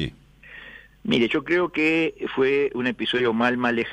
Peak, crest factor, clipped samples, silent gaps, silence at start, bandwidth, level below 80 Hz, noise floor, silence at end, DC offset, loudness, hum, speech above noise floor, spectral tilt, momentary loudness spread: -6 dBFS; 16 dB; under 0.1%; none; 0 s; 10.5 kHz; -54 dBFS; -46 dBFS; 0 s; under 0.1%; -22 LUFS; none; 24 dB; -6 dB/octave; 18 LU